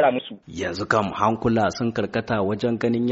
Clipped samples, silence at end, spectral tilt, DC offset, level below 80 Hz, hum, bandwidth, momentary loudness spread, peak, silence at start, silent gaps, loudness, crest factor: under 0.1%; 0 s; -5 dB/octave; under 0.1%; -52 dBFS; none; 8 kHz; 9 LU; -4 dBFS; 0 s; none; -23 LUFS; 18 dB